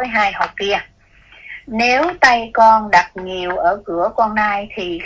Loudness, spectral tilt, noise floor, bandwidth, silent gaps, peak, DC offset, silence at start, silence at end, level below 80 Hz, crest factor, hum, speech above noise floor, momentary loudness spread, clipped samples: -15 LUFS; -3.5 dB/octave; -47 dBFS; 8 kHz; none; 0 dBFS; under 0.1%; 0 s; 0 s; -46 dBFS; 16 dB; none; 31 dB; 13 LU; under 0.1%